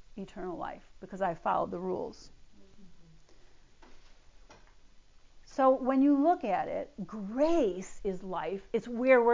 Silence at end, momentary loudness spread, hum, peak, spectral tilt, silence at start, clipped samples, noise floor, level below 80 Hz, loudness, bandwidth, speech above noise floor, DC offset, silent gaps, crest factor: 0 s; 16 LU; none; -10 dBFS; -6.5 dB/octave; 0.15 s; under 0.1%; -56 dBFS; -58 dBFS; -31 LUFS; 7.6 kHz; 26 dB; under 0.1%; none; 20 dB